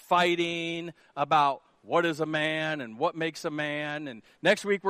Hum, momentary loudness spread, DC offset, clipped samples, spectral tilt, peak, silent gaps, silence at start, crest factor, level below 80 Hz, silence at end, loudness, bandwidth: none; 12 LU; under 0.1%; under 0.1%; -4.5 dB/octave; -8 dBFS; none; 0.1 s; 20 dB; -74 dBFS; 0 s; -28 LUFS; 15 kHz